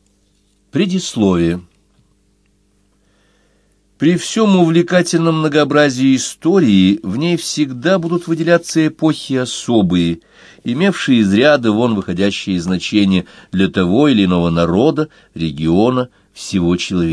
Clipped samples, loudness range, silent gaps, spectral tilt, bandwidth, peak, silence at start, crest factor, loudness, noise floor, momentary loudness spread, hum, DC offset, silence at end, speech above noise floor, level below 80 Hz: under 0.1%; 7 LU; none; -5.5 dB/octave; 11 kHz; 0 dBFS; 0.75 s; 14 dB; -14 LUFS; -57 dBFS; 8 LU; none; under 0.1%; 0 s; 43 dB; -46 dBFS